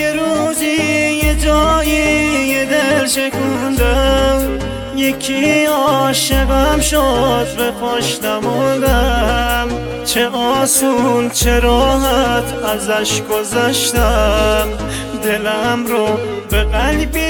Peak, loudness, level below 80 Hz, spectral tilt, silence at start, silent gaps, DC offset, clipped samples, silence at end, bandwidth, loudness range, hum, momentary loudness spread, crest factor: 0 dBFS; -14 LUFS; -22 dBFS; -4 dB/octave; 0 s; none; under 0.1%; under 0.1%; 0 s; 19.5 kHz; 2 LU; none; 5 LU; 14 dB